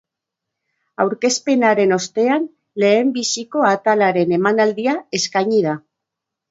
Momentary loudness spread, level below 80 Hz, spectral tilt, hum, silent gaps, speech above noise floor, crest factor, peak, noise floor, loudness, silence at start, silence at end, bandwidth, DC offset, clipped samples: 6 LU; -68 dBFS; -4 dB/octave; none; none; 65 dB; 16 dB; -2 dBFS; -82 dBFS; -17 LUFS; 1 s; 0.7 s; 8 kHz; under 0.1%; under 0.1%